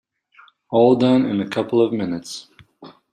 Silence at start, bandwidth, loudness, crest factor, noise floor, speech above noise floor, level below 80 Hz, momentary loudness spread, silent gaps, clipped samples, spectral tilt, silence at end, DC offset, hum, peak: 0.7 s; 11 kHz; -18 LUFS; 18 dB; -52 dBFS; 35 dB; -64 dBFS; 15 LU; none; under 0.1%; -6.5 dB/octave; 0.2 s; under 0.1%; none; -2 dBFS